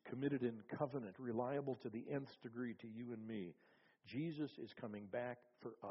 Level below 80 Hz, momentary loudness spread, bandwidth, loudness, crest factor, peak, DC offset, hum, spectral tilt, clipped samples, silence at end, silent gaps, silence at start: -86 dBFS; 10 LU; 5.8 kHz; -47 LUFS; 20 dB; -26 dBFS; under 0.1%; none; -6.5 dB/octave; under 0.1%; 0 s; none; 0.05 s